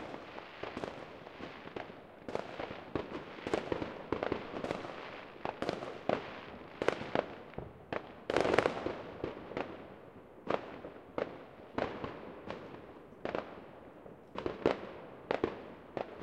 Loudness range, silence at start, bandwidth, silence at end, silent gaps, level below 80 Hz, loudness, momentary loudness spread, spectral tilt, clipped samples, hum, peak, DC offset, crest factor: 7 LU; 0 s; 13 kHz; 0 s; none; -64 dBFS; -40 LUFS; 14 LU; -5.5 dB/octave; under 0.1%; none; -6 dBFS; under 0.1%; 34 dB